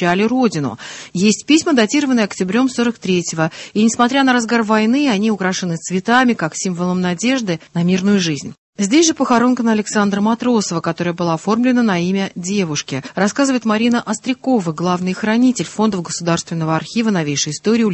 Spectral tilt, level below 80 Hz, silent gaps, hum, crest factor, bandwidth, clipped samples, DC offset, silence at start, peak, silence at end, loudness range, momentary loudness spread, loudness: -4.5 dB/octave; -56 dBFS; 8.58-8.73 s; none; 16 dB; 8.6 kHz; under 0.1%; under 0.1%; 0 s; 0 dBFS; 0 s; 2 LU; 7 LU; -16 LUFS